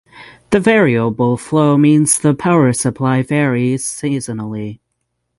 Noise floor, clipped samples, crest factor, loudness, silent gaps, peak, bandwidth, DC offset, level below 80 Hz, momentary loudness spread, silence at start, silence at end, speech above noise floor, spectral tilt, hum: -71 dBFS; under 0.1%; 14 dB; -14 LUFS; none; 0 dBFS; 12 kHz; under 0.1%; -50 dBFS; 11 LU; 0.15 s; 0.65 s; 57 dB; -5.5 dB/octave; none